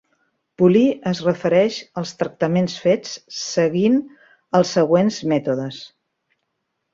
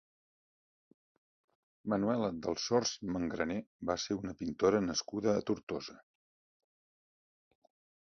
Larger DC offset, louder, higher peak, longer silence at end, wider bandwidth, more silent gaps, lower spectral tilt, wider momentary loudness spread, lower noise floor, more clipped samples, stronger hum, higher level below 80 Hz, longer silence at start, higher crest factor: neither; first, -19 LUFS vs -35 LUFS; first, -2 dBFS vs -16 dBFS; second, 1.05 s vs 2.1 s; about the same, 7.8 kHz vs 7.2 kHz; second, none vs 3.67-3.79 s, 5.63-5.67 s; first, -6 dB/octave vs -4.5 dB/octave; about the same, 11 LU vs 9 LU; second, -75 dBFS vs under -90 dBFS; neither; neither; about the same, -62 dBFS vs -64 dBFS; second, 0.6 s vs 1.85 s; about the same, 18 dB vs 22 dB